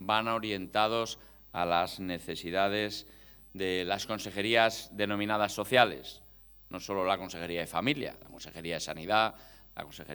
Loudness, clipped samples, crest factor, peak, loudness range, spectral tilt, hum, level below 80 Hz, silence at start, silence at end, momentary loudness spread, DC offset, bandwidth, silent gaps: -31 LUFS; under 0.1%; 26 dB; -6 dBFS; 3 LU; -4 dB/octave; none; -62 dBFS; 0 s; 0 s; 19 LU; under 0.1%; 19 kHz; none